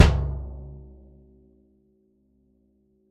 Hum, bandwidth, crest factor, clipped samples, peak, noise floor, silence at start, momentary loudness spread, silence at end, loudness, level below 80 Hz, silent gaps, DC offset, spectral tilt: none; 10.5 kHz; 24 dB; under 0.1%; -2 dBFS; -65 dBFS; 0 s; 26 LU; 2.35 s; -27 LUFS; -32 dBFS; none; under 0.1%; -6 dB/octave